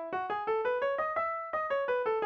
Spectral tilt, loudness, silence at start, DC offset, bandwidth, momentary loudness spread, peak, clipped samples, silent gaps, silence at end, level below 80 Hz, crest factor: -5.5 dB/octave; -32 LUFS; 0 s; under 0.1%; 6.6 kHz; 3 LU; -20 dBFS; under 0.1%; none; 0 s; -70 dBFS; 12 dB